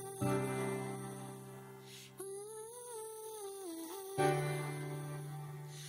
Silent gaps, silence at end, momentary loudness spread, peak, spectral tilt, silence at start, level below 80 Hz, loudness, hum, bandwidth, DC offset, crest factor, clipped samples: none; 0 s; 15 LU; -20 dBFS; -5.5 dB/octave; 0 s; -74 dBFS; -41 LUFS; none; 16 kHz; under 0.1%; 22 dB; under 0.1%